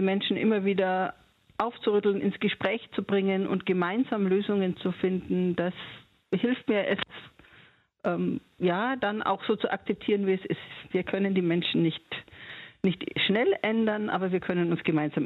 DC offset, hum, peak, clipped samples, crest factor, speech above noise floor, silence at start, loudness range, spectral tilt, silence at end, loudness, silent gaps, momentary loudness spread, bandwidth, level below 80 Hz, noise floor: under 0.1%; none; -10 dBFS; under 0.1%; 18 dB; 31 dB; 0 s; 3 LU; -8.5 dB/octave; 0 s; -28 LUFS; none; 9 LU; 4.6 kHz; -66 dBFS; -58 dBFS